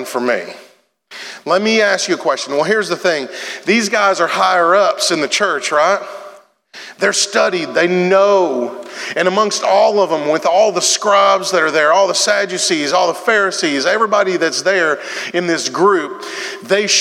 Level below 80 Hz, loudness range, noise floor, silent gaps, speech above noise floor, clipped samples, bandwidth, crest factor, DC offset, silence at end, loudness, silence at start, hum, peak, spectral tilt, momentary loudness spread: -78 dBFS; 3 LU; -40 dBFS; none; 26 dB; under 0.1%; 15.5 kHz; 14 dB; under 0.1%; 0 s; -14 LUFS; 0 s; none; 0 dBFS; -2.5 dB/octave; 10 LU